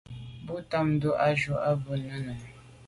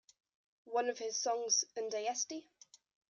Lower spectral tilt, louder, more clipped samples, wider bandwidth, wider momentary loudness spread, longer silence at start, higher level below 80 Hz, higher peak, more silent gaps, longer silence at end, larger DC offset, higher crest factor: first, -7.5 dB/octave vs 1 dB/octave; first, -29 LUFS vs -36 LUFS; neither; about the same, 11.5 kHz vs 10.5 kHz; first, 17 LU vs 7 LU; second, 0.1 s vs 0.65 s; first, -56 dBFS vs under -90 dBFS; first, -14 dBFS vs -20 dBFS; neither; second, 0 s vs 0.7 s; neither; about the same, 16 dB vs 20 dB